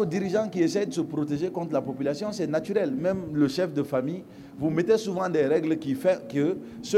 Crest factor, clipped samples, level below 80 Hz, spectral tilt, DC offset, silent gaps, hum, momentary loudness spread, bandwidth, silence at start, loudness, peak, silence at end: 16 dB; under 0.1%; -62 dBFS; -6.5 dB/octave; under 0.1%; none; none; 6 LU; 14.5 kHz; 0 s; -27 LUFS; -10 dBFS; 0 s